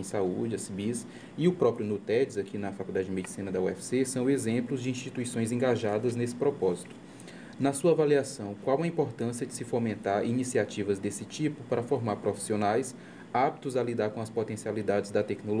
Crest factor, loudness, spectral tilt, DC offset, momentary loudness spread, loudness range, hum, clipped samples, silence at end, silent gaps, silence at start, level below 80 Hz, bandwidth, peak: 18 dB; -30 LUFS; -6 dB/octave; under 0.1%; 8 LU; 2 LU; none; under 0.1%; 0 s; none; 0 s; -72 dBFS; 10.5 kHz; -12 dBFS